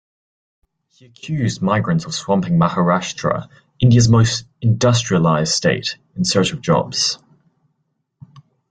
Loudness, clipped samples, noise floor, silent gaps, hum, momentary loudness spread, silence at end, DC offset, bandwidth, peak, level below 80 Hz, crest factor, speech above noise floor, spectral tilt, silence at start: -17 LUFS; under 0.1%; -70 dBFS; none; none; 9 LU; 0.3 s; under 0.1%; 9.2 kHz; -2 dBFS; -48 dBFS; 16 dB; 54 dB; -5 dB/octave; 1.25 s